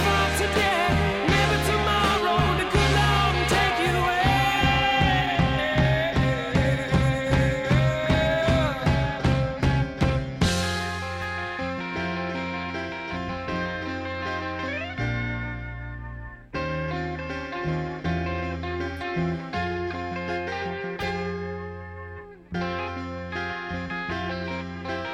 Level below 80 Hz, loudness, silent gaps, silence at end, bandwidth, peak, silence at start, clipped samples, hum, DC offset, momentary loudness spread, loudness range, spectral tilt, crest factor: -36 dBFS; -25 LUFS; none; 0 s; 16 kHz; -10 dBFS; 0 s; under 0.1%; none; under 0.1%; 11 LU; 10 LU; -5.5 dB/octave; 16 dB